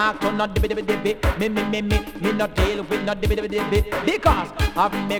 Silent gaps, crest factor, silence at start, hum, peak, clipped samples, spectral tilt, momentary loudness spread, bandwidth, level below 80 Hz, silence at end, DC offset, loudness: none; 18 dB; 0 s; none; -2 dBFS; under 0.1%; -6 dB/octave; 4 LU; over 20 kHz; -28 dBFS; 0 s; under 0.1%; -22 LUFS